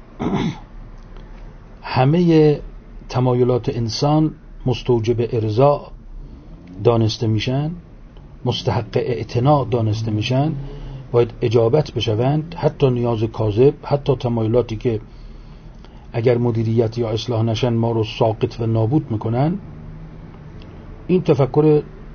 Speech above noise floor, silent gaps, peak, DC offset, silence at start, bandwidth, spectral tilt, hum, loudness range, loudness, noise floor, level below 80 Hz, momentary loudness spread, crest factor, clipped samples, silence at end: 22 dB; none; -2 dBFS; under 0.1%; 0 s; 6.8 kHz; -7.5 dB/octave; none; 3 LU; -19 LUFS; -39 dBFS; -38 dBFS; 14 LU; 18 dB; under 0.1%; 0 s